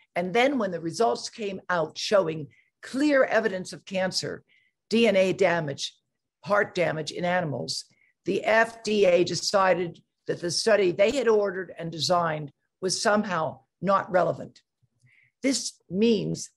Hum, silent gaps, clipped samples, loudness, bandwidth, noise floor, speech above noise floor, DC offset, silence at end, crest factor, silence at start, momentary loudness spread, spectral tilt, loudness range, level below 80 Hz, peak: none; none; under 0.1%; -25 LUFS; 12.5 kHz; -65 dBFS; 40 dB; under 0.1%; 0.1 s; 18 dB; 0.15 s; 13 LU; -4 dB/octave; 4 LU; -66 dBFS; -8 dBFS